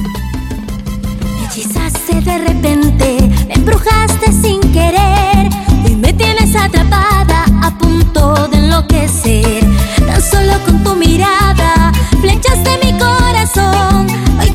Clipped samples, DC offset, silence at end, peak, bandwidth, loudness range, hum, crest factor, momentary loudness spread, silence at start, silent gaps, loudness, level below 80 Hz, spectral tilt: under 0.1%; 0.3%; 0 s; 0 dBFS; 16.5 kHz; 2 LU; none; 10 dB; 7 LU; 0 s; none; -10 LUFS; -14 dBFS; -5 dB/octave